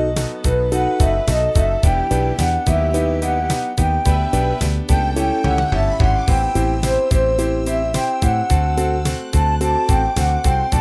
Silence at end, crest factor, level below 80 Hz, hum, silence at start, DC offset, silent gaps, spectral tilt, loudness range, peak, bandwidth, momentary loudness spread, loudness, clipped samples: 0 s; 14 dB; -20 dBFS; none; 0 s; under 0.1%; none; -6 dB/octave; 1 LU; -2 dBFS; 11 kHz; 3 LU; -18 LUFS; under 0.1%